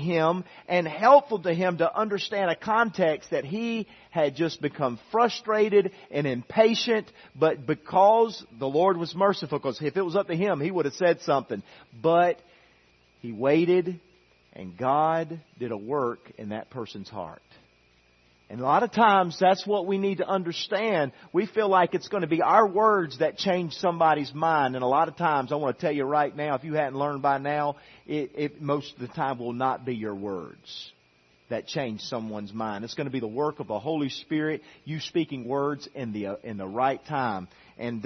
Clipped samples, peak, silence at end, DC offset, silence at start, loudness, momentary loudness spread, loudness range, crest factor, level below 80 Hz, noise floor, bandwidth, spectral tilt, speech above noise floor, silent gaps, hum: under 0.1%; -4 dBFS; 0 s; under 0.1%; 0 s; -26 LUFS; 14 LU; 8 LU; 22 dB; -70 dBFS; -63 dBFS; 6.4 kHz; -6 dB/octave; 37 dB; none; none